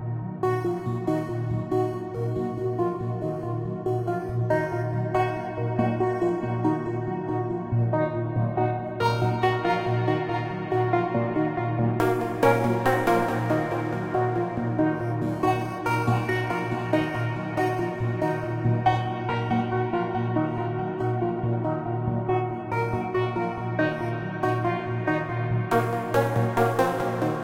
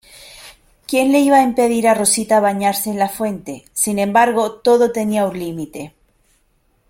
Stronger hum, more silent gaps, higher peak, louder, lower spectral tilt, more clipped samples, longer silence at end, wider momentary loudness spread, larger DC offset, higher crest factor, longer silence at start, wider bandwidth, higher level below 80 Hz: neither; neither; second, -6 dBFS vs 0 dBFS; second, -26 LUFS vs -16 LUFS; first, -8 dB/octave vs -4 dB/octave; neither; second, 0 s vs 1 s; second, 5 LU vs 15 LU; neither; about the same, 18 dB vs 16 dB; second, 0 s vs 0.2 s; about the same, 16 kHz vs 16.5 kHz; about the same, -52 dBFS vs -54 dBFS